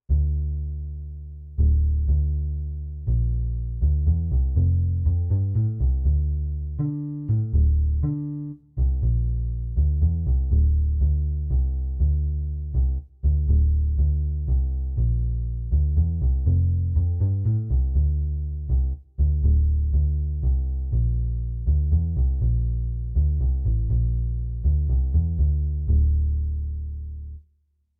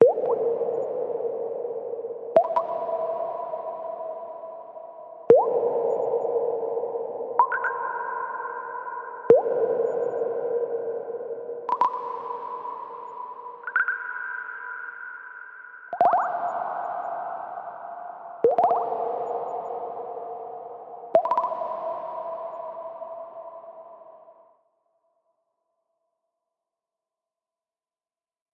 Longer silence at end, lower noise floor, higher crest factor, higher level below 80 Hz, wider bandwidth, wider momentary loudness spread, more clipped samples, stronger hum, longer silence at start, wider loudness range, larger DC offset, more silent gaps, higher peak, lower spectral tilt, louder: second, 0.6 s vs 4.2 s; second, -67 dBFS vs under -90 dBFS; second, 10 dB vs 26 dB; first, -24 dBFS vs under -90 dBFS; second, 0.9 kHz vs 4.7 kHz; second, 8 LU vs 17 LU; neither; neither; about the same, 0.1 s vs 0 s; second, 2 LU vs 7 LU; neither; neither; second, -12 dBFS vs -2 dBFS; first, -15.5 dB/octave vs -7.5 dB/octave; first, -24 LUFS vs -27 LUFS